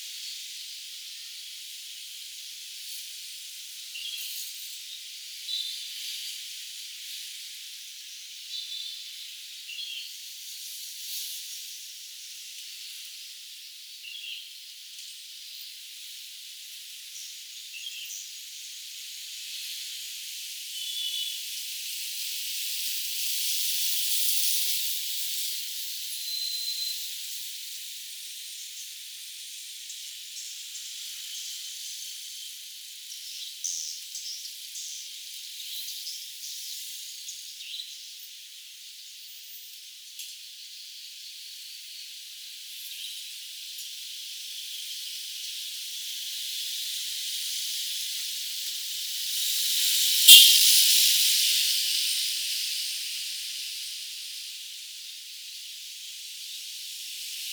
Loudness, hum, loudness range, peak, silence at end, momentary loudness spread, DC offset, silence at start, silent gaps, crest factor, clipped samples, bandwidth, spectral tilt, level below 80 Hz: -26 LUFS; none; 21 LU; 0 dBFS; 0 s; 16 LU; under 0.1%; 0 s; none; 30 dB; under 0.1%; over 20 kHz; 6.5 dB/octave; -88 dBFS